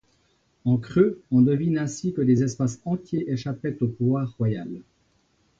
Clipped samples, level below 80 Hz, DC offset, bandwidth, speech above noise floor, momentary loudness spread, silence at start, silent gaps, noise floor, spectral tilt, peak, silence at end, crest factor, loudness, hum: under 0.1%; -56 dBFS; under 0.1%; 7.8 kHz; 43 dB; 9 LU; 0.65 s; none; -66 dBFS; -8 dB/octave; -6 dBFS; 0.8 s; 18 dB; -24 LUFS; none